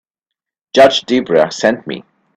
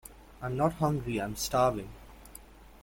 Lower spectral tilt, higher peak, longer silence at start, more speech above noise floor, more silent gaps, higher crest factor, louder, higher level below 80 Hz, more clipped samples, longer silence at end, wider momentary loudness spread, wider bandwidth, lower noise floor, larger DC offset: second, -4 dB/octave vs -5.5 dB/octave; first, 0 dBFS vs -12 dBFS; first, 0.75 s vs 0.05 s; first, 70 dB vs 22 dB; neither; second, 14 dB vs 20 dB; first, -13 LUFS vs -31 LUFS; about the same, -56 dBFS vs -52 dBFS; neither; first, 0.35 s vs 0.05 s; second, 15 LU vs 23 LU; second, 12 kHz vs 17 kHz; first, -82 dBFS vs -52 dBFS; neither